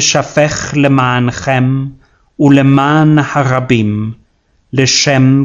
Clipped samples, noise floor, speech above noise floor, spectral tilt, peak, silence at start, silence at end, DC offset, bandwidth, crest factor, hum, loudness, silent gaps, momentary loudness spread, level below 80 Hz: 0.4%; -55 dBFS; 45 dB; -5 dB/octave; 0 dBFS; 0 s; 0 s; under 0.1%; 7.8 kHz; 10 dB; none; -11 LUFS; none; 9 LU; -42 dBFS